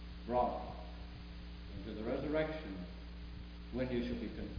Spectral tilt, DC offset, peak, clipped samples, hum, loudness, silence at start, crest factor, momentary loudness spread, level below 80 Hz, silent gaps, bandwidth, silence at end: -5.5 dB/octave; under 0.1%; -22 dBFS; under 0.1%; none; -41 LUFS; 0 s; 20 dB; 14 LU; -50 dBFS; none; 5.2 kHz; 0 s